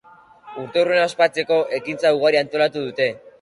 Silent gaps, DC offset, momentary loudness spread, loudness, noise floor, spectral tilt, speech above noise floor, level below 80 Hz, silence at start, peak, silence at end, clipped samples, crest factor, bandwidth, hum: none; under 0.1%; 7 LU; -19 LUFS; -46 dBFS; -4.5 dB/octave; 27 dB; -68 dBFS; 0.45 s; -4 dBFS; 0.1 s; under 0.1%; 16 dB; 11.5 kHz; none